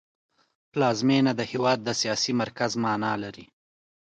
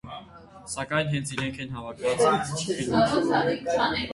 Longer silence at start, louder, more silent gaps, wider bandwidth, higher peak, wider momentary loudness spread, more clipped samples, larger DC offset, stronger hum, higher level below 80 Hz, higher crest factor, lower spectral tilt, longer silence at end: first, 0.75 s vs 0.05 s; about the same, -25 LUFS vs -26 LUFS; neither; second, 9.2 kHz vs 11.5 kHz; about the same, -10 dBFS vs -10 dBFS; second, 8 LU vs 13 LU; neither; neither; neither; second, -68 dBFS vs -52 dBFS; about the same, 16 dB vs 18 dB; about the same, -4.5 dB/octave vs -4.5 dB/octave; first, 0.7 s vs 0 s